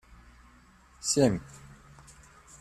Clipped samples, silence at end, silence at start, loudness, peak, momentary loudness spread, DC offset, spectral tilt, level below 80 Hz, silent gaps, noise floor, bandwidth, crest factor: under 0.1%; 1.05 s; 1.05 s; -28 LUFS; -10 dBFS; 26 LU; under 0.1%; -4.5 dB/octave; -56 dBFS; none; -58 dBFS; 14 kHz; 22 dB